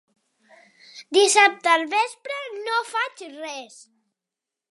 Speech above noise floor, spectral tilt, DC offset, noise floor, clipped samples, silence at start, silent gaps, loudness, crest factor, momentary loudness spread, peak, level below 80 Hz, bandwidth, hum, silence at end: 65 dB; 1 dB/octave; under 0.1%; -87 dBFS; under 0.1%; 0.95 s; none; -20 LUFS; 22 dB; 18 LU; -2 dBFS; -86 dBFS; 11.5 kHz; none; 1.05 s